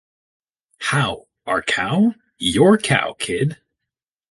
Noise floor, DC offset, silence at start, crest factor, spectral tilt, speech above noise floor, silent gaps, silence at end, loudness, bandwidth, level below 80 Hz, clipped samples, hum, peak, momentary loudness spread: -84 dBFS; under 0.1%; 0.8 s; 18 dB; -5 dB/octave; 66 dB; none; 0.75 s; -19 LUFS; 11.5 kHz; -50 dBFS; under 0.1%; none; -2 dBFS; 10 LU